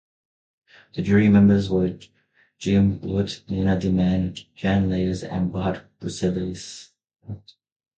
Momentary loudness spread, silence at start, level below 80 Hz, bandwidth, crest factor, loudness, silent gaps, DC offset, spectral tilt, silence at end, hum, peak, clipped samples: 20 LU; 0.95 s; -42 dBFS; 8.8 kHz; 18 dB; -22 LUFS; none; under 0.1%; -7.5 dB/octave; 0.6 s; none; -4 dBFS; under 0.1%